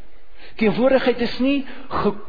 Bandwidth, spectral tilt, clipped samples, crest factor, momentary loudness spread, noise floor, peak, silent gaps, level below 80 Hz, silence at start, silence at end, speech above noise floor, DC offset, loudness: 5 kHz; -7.5 dB/octave; under 0.1%; 16 dB; 9 LU; -45 dBFS; -6 dBFS; none; -44 dBFS; 0.4 s; 0 s; 26 dB; 4%; -20 LUFS